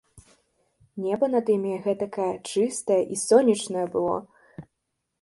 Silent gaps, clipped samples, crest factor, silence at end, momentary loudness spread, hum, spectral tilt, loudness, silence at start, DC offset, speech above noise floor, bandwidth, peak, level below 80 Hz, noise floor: none; under 0.1%; 20 dB; 0.6 s; 10 LU; none; -5 dB/octave; -25 LUFS; 0.15 s; under 0.1%; 56 dB; 11.5 kHz; -4 dBFS; -66 dBFS; -79 dBFS